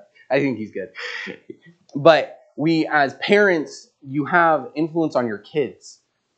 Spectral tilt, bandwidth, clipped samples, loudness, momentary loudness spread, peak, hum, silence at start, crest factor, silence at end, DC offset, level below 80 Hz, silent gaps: -6 dB/octave; 8.6 kHz; under 0.1%; -20 LUFS; 16 LU; 0 dBFS; none; 0.3 s; 20 dB; 0.45 s; under 0.1%; -76 dBFS; none